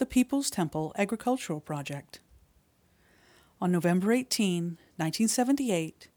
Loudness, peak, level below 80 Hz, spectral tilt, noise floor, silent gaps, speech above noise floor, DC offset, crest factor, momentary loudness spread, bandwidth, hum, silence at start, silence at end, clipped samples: -29 LUFS; -12 dBFS; -62 dBFS; -5 dB/octave; -66 dBFS; none; 37 dB; under 0.1%; 18 dB; 10 LU; over 20 kHz; none; 0 s; 0.1 s; under 0.1%